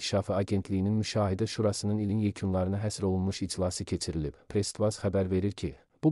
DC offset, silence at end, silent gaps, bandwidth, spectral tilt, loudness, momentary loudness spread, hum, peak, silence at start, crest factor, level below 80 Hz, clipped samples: under 0.1%; 0 s; none; 12 kHz; -6 dB/octave; -31 LUFS; 5 LU; none; -14 dBFS; 0 s; 16 dB; -52 dBFS; under 0.1%